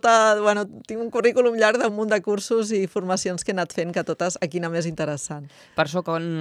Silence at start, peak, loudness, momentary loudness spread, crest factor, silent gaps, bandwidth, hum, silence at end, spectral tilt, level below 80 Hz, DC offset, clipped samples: 0.05 s; -4 dBFS; -23 LUFS; 9 LU; 18 dB; none; 13.5 kHz; none; 0 s; -4.5 dB/octave; -64 dBFS; under 0.1%; under 0.1%